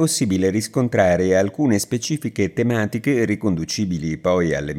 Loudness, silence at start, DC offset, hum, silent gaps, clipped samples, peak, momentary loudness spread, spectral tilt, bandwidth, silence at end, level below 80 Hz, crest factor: -20 LUFS; 0 s; under 0.1%; none; none; under 0.1%; -4 dBFS; 6 LU; -5.5 dB/octave; 16.5 kHz; 0 s; -50 dBFS; 16 dB